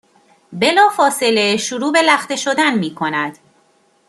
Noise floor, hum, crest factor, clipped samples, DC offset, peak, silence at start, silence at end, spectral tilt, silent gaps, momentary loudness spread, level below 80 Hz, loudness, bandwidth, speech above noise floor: -57 dBFS; none; 16 dB; under 0.1%; under 0.1%; 0 dBFS; 0.5 s; 0.75 s; -3 dB/octave; none; 8 LU; -66 dBFS; -15 LUFS; 13.5 kHz; 41 dB